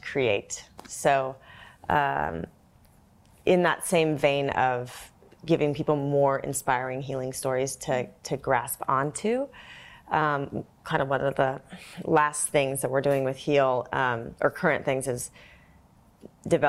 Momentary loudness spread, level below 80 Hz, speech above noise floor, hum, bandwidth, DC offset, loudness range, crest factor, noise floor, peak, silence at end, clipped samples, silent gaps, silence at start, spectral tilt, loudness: 14 LU; -58 dBFS; 31 dB; none; 16 kHz; under 0.1%; 3 LU; 20 dB; -58 dBFS; -8 dBFS; 0 s; under 0.1%; none; 0.05 s; -4.5 dB/octave; -26 LUFS